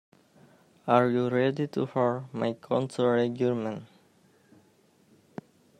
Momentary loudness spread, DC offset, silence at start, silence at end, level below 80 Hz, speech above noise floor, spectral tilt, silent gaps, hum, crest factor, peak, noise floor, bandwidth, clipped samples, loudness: 20 LU; under 0.1%; 0.85 s; 1.95 s; -74 dBFS; 37 dB; -7.5 dB/octave; none; none; 22 dB; -8 dBFS; -63 dBFS; 11.5 kHz; under 0.1%; -27 LUFS